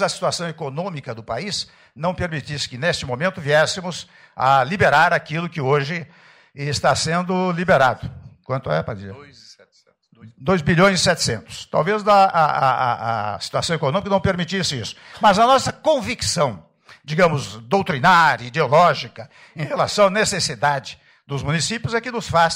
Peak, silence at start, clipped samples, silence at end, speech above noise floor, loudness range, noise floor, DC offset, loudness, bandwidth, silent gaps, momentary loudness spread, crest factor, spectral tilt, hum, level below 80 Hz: -6 dBFS; 0 s; under 0.1%; 0 s; 39 dB; 5 LU; -59 dBFS; under 0.1%; -19 LUFS; 16 kHz; none; 14 LU; 14 dB; -4 dB/octave; none; -48 dBFS